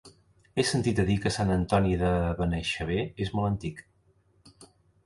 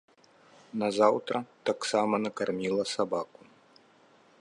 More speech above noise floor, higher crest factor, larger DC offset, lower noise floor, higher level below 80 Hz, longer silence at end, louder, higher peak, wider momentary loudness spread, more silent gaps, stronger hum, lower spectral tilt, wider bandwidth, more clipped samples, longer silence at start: first, 38 dB vs 32 dB; about the same, 20 dB vs 22 dB; neither; first, -65 dBFS vs -61 dBFS; first, -42 dBFS vs -76 dBFS; second, 0.4 s vs 1.15 s; about the same, -28 LUFS vs -29 LUFS; about the same, -8 dBFS vs -8 dBFS; about the same, 8 LU vs 10 LU; neither; neither; first, -6 dB/octave vs -4.5 dB/octave; about the same, 11.5 kHz vs 11.5 kHz; neither; second, 0.05 s vs 0.75 s